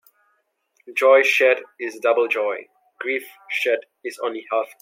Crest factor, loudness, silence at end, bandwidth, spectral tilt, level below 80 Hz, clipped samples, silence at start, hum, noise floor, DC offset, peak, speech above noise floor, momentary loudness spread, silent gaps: 18 dB; -20 LUFS; 0.15 s; 16.5 kHz; -1 dB/octave; -86 dBFS; under 0.1%; 0.85 s; none; -68 dBFS; under 0.1%; -4 dBFS; 48 dB; 15 LU; none